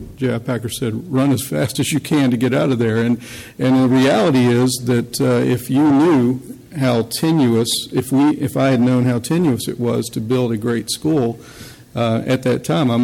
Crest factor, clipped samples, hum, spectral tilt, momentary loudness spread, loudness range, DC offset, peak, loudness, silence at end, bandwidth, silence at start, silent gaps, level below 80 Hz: 12 dB; under 0.1%; none; -6 dB/octave; 8 LU; 4 LU; under 0.1%; -4 dBFS; -17 LUFS; 0 s; 17 kHz; 0 s; none; -50 dBFS